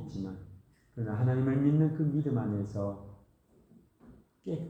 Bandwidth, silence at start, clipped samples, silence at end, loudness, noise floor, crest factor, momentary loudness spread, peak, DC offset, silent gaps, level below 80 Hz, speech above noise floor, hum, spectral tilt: 6.6 kHz; 0 s; under 0.1%; 0 s; -31 LUFS; -64 dBFS; 16 dB; 19 LU; -16 dBFS; under 0.1%; none; -62 dBFS; 34 dB; none; -10.5 dB/octave